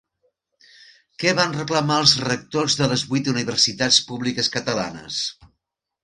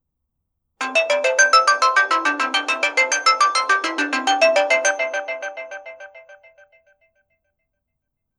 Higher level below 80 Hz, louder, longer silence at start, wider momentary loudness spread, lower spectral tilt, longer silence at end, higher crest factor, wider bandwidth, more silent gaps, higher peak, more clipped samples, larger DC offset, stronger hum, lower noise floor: first, -58 dBFS vs -80 dBFS; second, -20 LUFS vs -17 LUFS; first, 1.2 s vs 0.8 s; second, 10 LU vs 15 LU; first, -3 dB/octave vs 2 dB/octave; second, 0.7 s vs 2.05 s; about the same, 22 dB vs 18 dB; second, 11.5 kHz vs 13 kHz; neither; about the same, -2 dBFS vs -2 dBFS; neither; neither; neither; about the same, -79 dBFS vs -78 dBFS